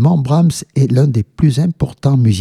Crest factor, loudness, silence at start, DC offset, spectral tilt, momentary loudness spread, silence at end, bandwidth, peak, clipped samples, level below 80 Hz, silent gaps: 12 dB; -14 LUFS; 0 s; under 0.1%; -7.5 dB/octave; 4 LU; 0 s; 12.5 kHz; 0 dBFS; under 0.1%; -38 dBFS; none